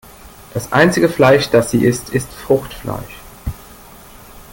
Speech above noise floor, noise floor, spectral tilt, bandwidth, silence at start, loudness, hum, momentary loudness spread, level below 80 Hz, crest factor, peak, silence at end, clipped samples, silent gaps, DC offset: 25 dB; -39 dBFS; -5.5 dB/octave; 17 kHz; 0.25 s; -15 LUFS; none; 18 LU; -40 dBFS; 16 dB; 0 dBFS; 0.15 s; under 0.1%; none; under 0.1%